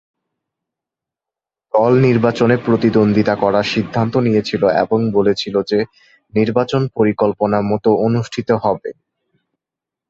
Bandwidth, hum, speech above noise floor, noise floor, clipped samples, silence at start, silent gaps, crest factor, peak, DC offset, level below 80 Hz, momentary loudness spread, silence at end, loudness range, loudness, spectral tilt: 7.6 kHz; none; 72 dB; -87 dBFS; under 0.1%; 1.75 s; none; 16 dB; -2 dBFS; under 0.1%; -50 dBFS; 6 LU; 1.2 s; 2 LU; -16 LUFS; -7.5 dB/octave